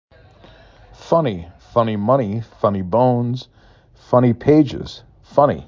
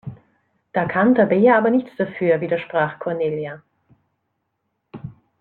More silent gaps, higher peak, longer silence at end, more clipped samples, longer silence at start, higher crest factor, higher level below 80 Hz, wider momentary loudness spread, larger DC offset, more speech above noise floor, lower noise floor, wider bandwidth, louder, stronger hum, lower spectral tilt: neither; about the same, -2 dBFS vs -4 dBFS; second, 0.05 s vs 0.3 s; neither; first, 1 s vs 0.05 s; about the same, 18 dB vs 18 dB; first, -46 dBFS vs -62 dBFS; second, 14 LU vs 23 LU; neither; second, 30 dB vs 56 dB; second, -46 dBFS vs -74 dBFS; first, 7.4 kHz vs 4.3 kHz; about the same, -18 LUFS vs -19 LUFS; neither; about the same, -9 dB/octave vs -10 dB/octave